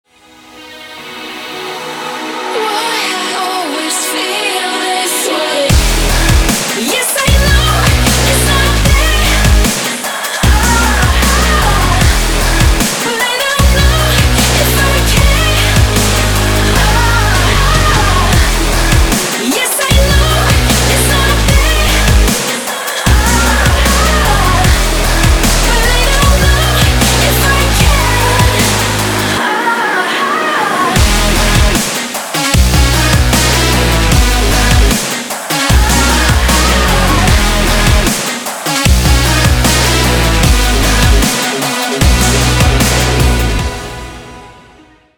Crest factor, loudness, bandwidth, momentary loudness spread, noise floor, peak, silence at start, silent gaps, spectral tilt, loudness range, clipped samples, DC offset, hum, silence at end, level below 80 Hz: 10 dB; -10 LUFS; over 20 kHz; 6 LU; -42 dBFS; 0 dBFS; 0.55 s; none; -3.5 dB/octave; 2 LU; under 0.1%; under 0.1%; none; 0.65 s; -14 dBFS